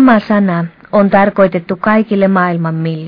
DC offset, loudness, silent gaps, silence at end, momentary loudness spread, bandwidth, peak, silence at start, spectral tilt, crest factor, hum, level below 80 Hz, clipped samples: under 0.1%; -12 LUFS; none; 0 s; 7 LU; 5.2 kHz; 0 dBFS; 0 s; -10 dB/octave; 12 dB; none; -48 dBFS; 0.1%